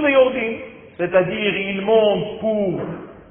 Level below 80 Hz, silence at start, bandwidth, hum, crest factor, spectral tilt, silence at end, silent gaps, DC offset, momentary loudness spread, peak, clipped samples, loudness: -52 dBFS; 0 s; 3.5 kHz; none; 16 dB; -10.5 dB/octave; 0.1 s; none; under 0.1%; 15 LU; -4 dBFS; under 0.1%; -19 LUFS